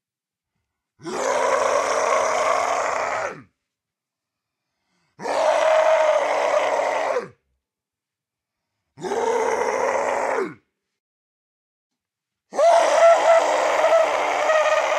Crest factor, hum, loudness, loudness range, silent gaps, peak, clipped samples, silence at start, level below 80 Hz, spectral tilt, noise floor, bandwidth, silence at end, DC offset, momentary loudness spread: 18 dB; none; -20 LUFS; 7 LU; 11.00-11.90 s; -4 dBFS; under 0.1%; 1.05 s; -68 dBFS; -1.5 dB/octave; -88 dBFS; 12 kHz; 0 s; under 0.1%; 12 LU